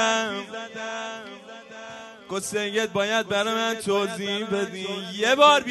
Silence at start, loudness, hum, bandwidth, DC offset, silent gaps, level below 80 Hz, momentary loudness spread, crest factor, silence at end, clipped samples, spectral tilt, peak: 0 s; -24 LUFS; none; 12 kHz; under 0.1%; none; -68 dBFS; 19 LU; 22 dB; 0 s; under 0.1%; -2.5 dB/octave; -2 dBFS